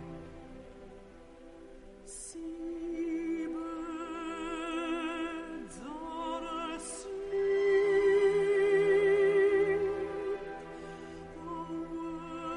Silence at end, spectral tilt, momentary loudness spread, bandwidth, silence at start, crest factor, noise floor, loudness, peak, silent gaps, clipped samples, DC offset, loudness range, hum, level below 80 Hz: 0 s; -5 dB/octave; 22 LU; 11 kHz; 0 s; 14 dB; -52 dBFS; -32 LUFS; -18 dBFS; none; under 0.1%; under 0.1%; 12 LU; none; -58 dBFS